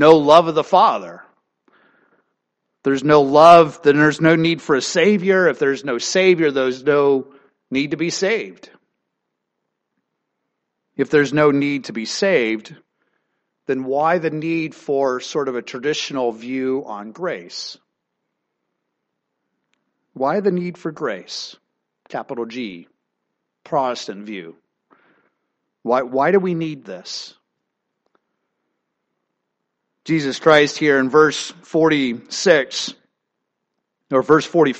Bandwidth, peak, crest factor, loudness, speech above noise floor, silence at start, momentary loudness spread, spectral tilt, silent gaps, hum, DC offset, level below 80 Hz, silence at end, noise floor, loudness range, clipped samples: 8.4 kHz; 0 dBFS; 20 dB; -17 LUFS; 60 dB; 0 s; 16 LU; -5 dB/octave; none; none; under 0.1%; -62 dBFS; 0 s; -77 dBFS; 14 LU; under 0.1%